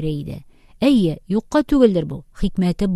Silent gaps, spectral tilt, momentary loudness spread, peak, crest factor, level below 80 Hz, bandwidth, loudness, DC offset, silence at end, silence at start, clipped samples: none; -7.5 dB/octave; 14 LU; 0 dBFS; 18 dB; -36 dBFS; 13 kHz; -19 LUFS; under 0.1%; 0 s; 0 s; under 0.1%